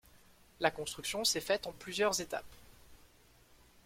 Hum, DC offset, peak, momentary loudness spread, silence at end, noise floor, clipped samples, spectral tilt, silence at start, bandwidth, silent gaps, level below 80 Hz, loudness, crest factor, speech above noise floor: none; under 0.1%; -12 dBFS; 9 LU; 0.8 s; -64 dBFS; under 0.1%; -2 dB/octave; 0.15 s; 16.5 kHz; none; -64 dBFS; -35 LUFS; 26 dB; 28 dB